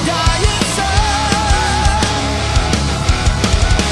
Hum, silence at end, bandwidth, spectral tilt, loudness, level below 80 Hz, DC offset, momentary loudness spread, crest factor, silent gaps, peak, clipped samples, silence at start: none; 0 s; 12 kHz; -4 dB/octave; -15 LUFS; -18 dBFS; under 0.1%; 2 LU; 12 dB; none; -2 dBFS; under 0.1%; 0 s